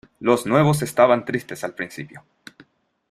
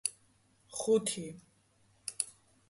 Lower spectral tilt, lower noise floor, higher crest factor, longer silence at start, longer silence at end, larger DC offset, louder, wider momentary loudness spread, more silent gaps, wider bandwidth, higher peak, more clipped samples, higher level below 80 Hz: first, -6 dB/octave vs -3 dB/octave; second, -54 dBFS vs -69 dBFS; second, 20 dB vs 26 dB; first, 0.2 s vs 0.05 s; first, 0.95 s vs 0.4 s; neither; first, -20 LUFS vs -35 LUFS; about the same, 15 LU vs 16 LU; neither; first, 15 kHz vs 12 kHz; first, -2 dBFS vs -12 dBFS; neither; first, -58 dBFS vs -76 dBFS